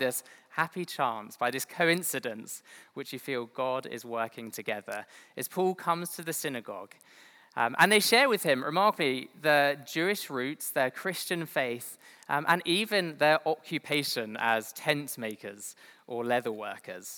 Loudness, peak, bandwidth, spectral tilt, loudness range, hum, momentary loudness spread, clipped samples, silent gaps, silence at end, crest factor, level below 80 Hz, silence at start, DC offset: -29 LUFS; -4 dBFS; over 20 kHz; -3 dB/octave; 9 LU; none; 16 LU; under 0.1%; none; 0 s; 26 dB; under -90 dBFS; 0 s; under 0.1%